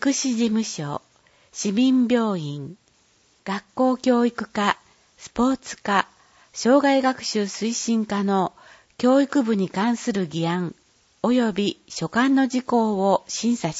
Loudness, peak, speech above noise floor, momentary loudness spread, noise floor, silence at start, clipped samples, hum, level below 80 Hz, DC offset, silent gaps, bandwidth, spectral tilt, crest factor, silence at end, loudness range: -22 LUFS; -2 dBFS; 39 dB; 12 LU; -61 dBFS; 0 s; under 0.1%; none; -60 dBFS; under 0.1%; none; 8 kHz; -4.5 dB/octave; 20 dB; 0 s; 3 LU